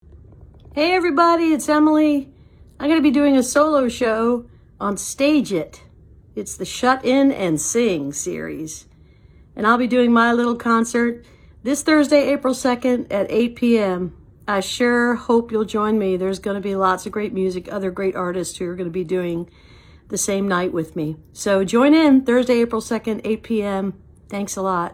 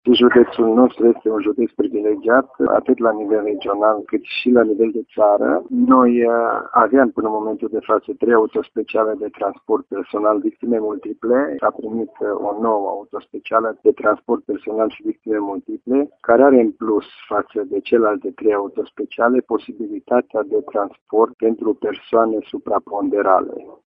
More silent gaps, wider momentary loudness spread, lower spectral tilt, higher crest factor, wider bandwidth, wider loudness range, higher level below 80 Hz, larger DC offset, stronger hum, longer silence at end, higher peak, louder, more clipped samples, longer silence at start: second, none vs 21.01-21.06 s, 21.34-21.38 s; about the same, 12 LU vs 10 LU; second, -4.5 dB/octave vs -9 dB/octave; about the same, 18 dB vs 18 dB; first, 16 kHz vs 5.2 kHz; about the same, 6 LU vs 5 LU; first, -50 dBFS vs -60 dBFS; neither; neither; second, 0 s vs 0.2 s; about the same, -2 dBFS vs 0 dBFS; about the same, -19 LUFS vs -18 LUFS; neither; about the same, 0.15 s vs 0.05 s